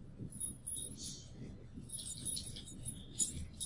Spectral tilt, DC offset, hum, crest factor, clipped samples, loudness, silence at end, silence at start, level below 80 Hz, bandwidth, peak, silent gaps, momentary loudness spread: -2.5 dB/octave; under 0.1%; none; 24 dB; under 0.1%; -42 LUFS; 0 s; 0 s; -56 dBFS; 11.5 kHz; -20 dBFS; none; 14 LU